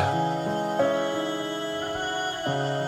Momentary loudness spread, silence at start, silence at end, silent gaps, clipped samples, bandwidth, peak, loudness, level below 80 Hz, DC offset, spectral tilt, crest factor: 5 LU; 0 s; 0 s; none; under 0.1%; 18.5 kHz; -12 dBFS; -27 LUFS; -60 dBFS; under 0.1%; -5 dB/octave; 16 dB